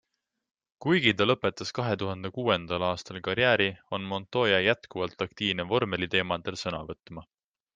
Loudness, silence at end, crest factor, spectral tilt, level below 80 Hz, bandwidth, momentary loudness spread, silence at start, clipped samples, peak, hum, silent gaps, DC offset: -28 LUFS; 0.55 s; 22 dB; -5 dB/octave; -62 dBFS; 9.4 kHz; 12 LU; 0.8 s; under 0.1%; -6 dBFS; none; none; under 0.1%